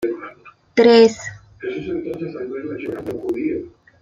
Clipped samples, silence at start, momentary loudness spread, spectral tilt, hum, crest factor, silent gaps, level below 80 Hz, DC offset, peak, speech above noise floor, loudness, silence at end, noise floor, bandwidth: under 0.1%; 0 s; 20 LU; -5 dB/octave; none; 18 dB; none; -56 dBFS; under 0.1%; -2 dBFS; 28 dB; -19 LUFS; 0.3 s; -43 dBFS; 7.6 kHz